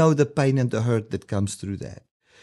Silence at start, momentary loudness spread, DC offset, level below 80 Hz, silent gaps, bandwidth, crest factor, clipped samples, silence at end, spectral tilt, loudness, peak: 0 s; 13 LU; under 0.1%; -56 dBFS; none; 12 kHz; 18 dB; under 0.1%; 0.45 s; -7 dB/octave; -24 LUFS; -6 dBFS